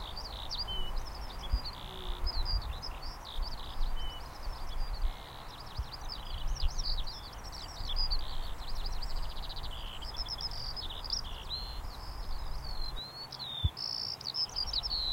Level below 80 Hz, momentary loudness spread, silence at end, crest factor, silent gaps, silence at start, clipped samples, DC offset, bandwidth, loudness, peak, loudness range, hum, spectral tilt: -38 dBFS; 10 LU; 0 s; 18 dB; none; 0 s; under 0.1%; under 0.1%; 16.5 kHz; -38 LUFS; -18 dBFS; 4 LU; none; -3.5 dB/octave